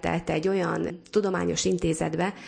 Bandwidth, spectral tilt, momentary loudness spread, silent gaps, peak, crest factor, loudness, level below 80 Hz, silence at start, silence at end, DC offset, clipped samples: 10.5 kHz; -5 dB/octave; 3 LU; none; -10 dBFS; 16 dB; -27 LUFS; -50 dBFS; 0 s; 0 s; under 0.1%; under 0.1%